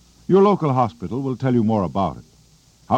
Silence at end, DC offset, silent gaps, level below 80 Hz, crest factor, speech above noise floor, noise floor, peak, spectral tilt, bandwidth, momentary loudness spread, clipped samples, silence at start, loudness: 0 s; under 0.1%; none; -52 dBFS; 16 dB; 35 dB; -53 dBFS; -4 dBFS; -9 dB/octave; 8.6 kHz; 10 LU; under 0.1%; 0.3 s; -20 LUFS